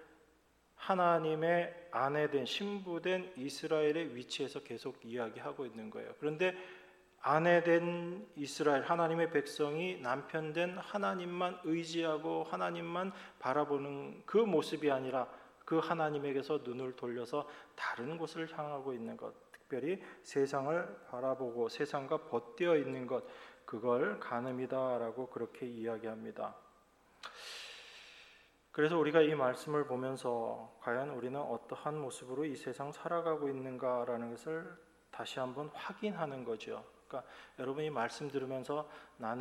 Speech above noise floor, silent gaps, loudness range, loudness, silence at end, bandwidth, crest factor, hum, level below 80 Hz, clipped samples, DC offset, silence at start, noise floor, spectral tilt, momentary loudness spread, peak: 33 dB; none; 7 LU; -37 LUFS; 0 s; 13.5 kHz; 22 dB; none; -80 dBFS; under 0.1%; under 0.1%; 0 s; -70 dBFS; -5.5 dB/octave; 13 LU; -14 dBFS